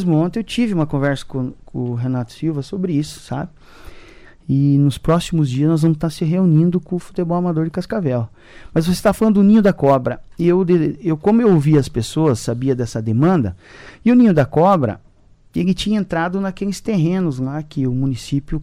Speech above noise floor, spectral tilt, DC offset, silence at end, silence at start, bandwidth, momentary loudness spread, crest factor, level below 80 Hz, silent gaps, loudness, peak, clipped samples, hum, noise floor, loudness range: 33 dB; -7.5 dB/octave; under 0.1%; 0 s; 0 s; 15 kHz; 11 LU; 12 dB; -40 dBFS; none; -18 LUFS; -4 dBFS; under 0.1%; none; -49 dBFS; 6 LU